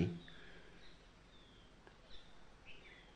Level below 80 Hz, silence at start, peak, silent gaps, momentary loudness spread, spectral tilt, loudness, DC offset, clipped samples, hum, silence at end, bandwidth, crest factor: -66 dBFS; 0 s; -22 dBFS; none; 9 LU; -7 dB/octave; -55 LUFS; under 0.1%; under 0.1%; none; 0 s; 9.6 kHz; 26 dB